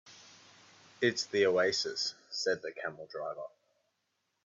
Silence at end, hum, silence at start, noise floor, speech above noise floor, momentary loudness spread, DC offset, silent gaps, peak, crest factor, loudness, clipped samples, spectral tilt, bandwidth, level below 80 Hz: 1 s; none; 0.05 s; -81 dBFS; 49 dB; 18 LU; under 0.1%; none; -14 dBFS; 20 dB; -33 LUFS; under 0.1%; -3 dB/octave; 7.8 kHz; -80 dBFS